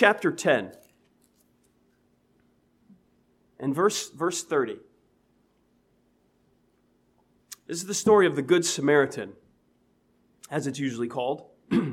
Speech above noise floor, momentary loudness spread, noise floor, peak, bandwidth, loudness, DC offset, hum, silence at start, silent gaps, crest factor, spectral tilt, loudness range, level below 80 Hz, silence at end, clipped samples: 42 dB; 16 LU; -67 dBFS; -4 dBFS; 16 kHz; -26 LUFS; under 0.1%; none; 0 s; none; 24 dB; -4 dB/octave; 10 LU; -72 dBFS; 0 s; under 0.1%